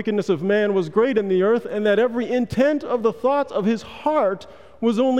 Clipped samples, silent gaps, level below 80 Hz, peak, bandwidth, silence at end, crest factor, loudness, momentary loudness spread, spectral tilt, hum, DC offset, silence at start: under 0.1%; none; -56 dBFS; -8 dBFS; 11 kHz; 0 s; 12 dB; -21 LUFS; 4 LU; -7 dB/octave; none; 0.4%; 0 s